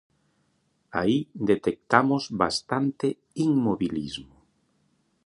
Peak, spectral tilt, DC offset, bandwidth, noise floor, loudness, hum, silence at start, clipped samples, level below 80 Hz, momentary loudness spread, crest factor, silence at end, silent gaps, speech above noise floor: -2 dBFS; -6 dB/octave; under 0.1%; 11.5 kHz; -70 dBFS; -26 LUFS; none; 0.95 s; under 0.1%; -58 dBFS; 9 LU; 26 dB; 1 s; none; 45 dB